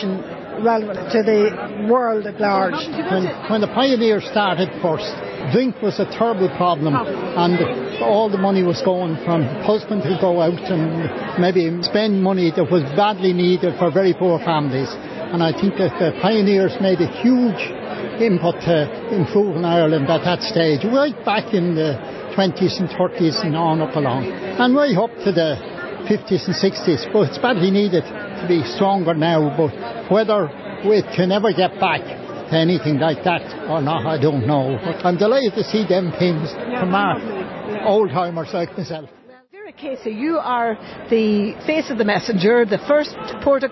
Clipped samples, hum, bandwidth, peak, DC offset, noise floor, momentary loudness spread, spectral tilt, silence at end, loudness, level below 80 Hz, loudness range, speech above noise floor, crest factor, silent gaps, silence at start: under 0.1%; none; 6.2 kHz; -4 dBFS; under 0.1%; -40 dBFS; 8 LU; -7 dB/octave; 0 s; -19 LUFS; -54 dBFS; 2 LU; 23 dB; 14 dB; none; 0 s